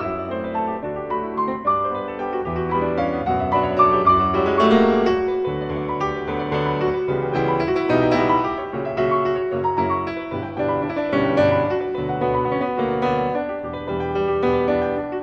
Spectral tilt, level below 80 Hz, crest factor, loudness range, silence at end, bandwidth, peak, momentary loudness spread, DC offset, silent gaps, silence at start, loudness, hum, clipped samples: -8 dB/octave; -44 dBFS; 18 dB; 4 LU; 0 s; 6.8 kHz; -4 dBFS; 9 LU; under 0.1%; none; 0 s; -21 LUFS; none; under 0.1%